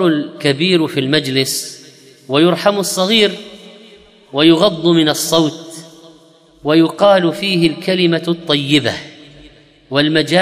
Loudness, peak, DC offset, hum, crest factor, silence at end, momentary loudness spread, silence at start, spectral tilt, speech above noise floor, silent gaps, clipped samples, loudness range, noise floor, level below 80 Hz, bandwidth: -14 LUFS; 0 dBFS; under 0.1%; none; 16 dB; 0 s; 12 LU; 0 s; -4.5 dB/octave; 33 dB; none; under 0.1%; 2 LU; -47 dBFS; -56 dBFS; 15.5 kHz